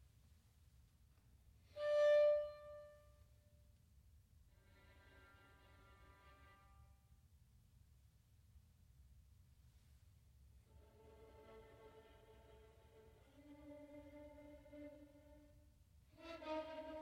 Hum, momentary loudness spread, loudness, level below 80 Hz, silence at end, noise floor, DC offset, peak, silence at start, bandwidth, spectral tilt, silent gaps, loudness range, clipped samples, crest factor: none; 31 LU; -39 LUFS; -72 dBFS; 0 s; -71 dBFS; under 0.1%; -28 dBFS; 1.75 s; 11 kHz; -5.5 dB/octave; none; 27 LU; under 0.1%; 20 dB